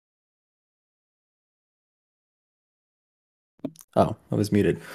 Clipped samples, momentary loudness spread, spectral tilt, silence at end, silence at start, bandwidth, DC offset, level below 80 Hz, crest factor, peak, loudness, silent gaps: under 0.1%; 17 LU; -7 dB/octave; 0 s; 3.65 s; 14.5 kHz; under 0.1%; -60 dBFS; 26 dB; -4 dBFS; -25 LUFS; 3.84-3.88 s